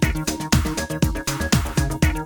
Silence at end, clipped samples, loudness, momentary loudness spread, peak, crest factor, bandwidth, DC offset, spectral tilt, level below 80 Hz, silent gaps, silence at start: 0 s; under 0.1%; -22 LUFS; 4 LU; -4 dBFS; 16 dB; over 20 kHz; under 0.1%; -4.5 dB/octave; -28 dBFS; none; 0 s